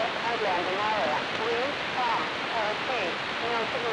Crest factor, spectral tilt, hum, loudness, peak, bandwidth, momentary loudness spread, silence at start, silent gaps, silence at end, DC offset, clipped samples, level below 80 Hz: 14 dB; -3.5 dB/octave; none; -28 LUFS; -14 dBFS; 11 kHz; 2 LU; 0 s; none; 0 s; under 0.1%; under 0.1%; -62 dBFS